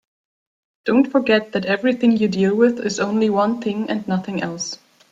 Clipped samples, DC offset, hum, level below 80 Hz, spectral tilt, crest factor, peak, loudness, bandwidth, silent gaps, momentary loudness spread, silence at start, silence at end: under 0.1%; under 0.1%; none; -62 dBFS; -5.5 dB/octave; 16 dB; -4 dBFS; -19 LUFS; 7.8 kHz; none; 9 LU; 0.85 s; 0.35 s